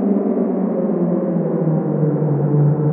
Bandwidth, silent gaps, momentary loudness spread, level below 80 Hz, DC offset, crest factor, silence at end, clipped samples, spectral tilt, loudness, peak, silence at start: 2.5 kHz; none; 3 LU; -62 dBFS; under 0.1%; 12 dB; 0 s; under 0.1%; -15.5 dB/octave; -18 LUFS; -4 dBFS; 0 s